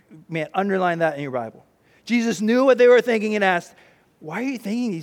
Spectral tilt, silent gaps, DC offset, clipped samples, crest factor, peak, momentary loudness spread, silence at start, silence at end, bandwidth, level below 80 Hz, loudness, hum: -5.5 dB/octave; none; under 0.1%; under 0.1%; 18 dB; -4 dBFS; 15 LU; 0.1 s; 0 s; 13.5 kHz; -72 dBFS; -20 LUFS; none